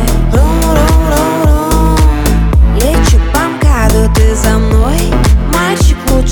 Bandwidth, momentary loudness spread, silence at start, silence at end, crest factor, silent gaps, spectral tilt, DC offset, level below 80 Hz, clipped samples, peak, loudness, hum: 19.5 kHz; 2 LU; 0 s; 0 s; 8 dB; none; -5.5 dB/octave; under 0.1%; -10 dBFS; under 0.1%; 0 dBFS; -10 LUFS; none